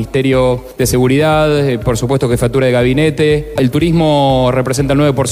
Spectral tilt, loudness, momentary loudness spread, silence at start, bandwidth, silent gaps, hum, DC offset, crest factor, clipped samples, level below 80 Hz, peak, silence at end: -6 dB/octave; -12 LUFS; 4 LU; 0 s; 16 kHz; none; none; under 0.1%; 10 dB; under 0.1%; -30 dBFS; -2 dBFS; 0 s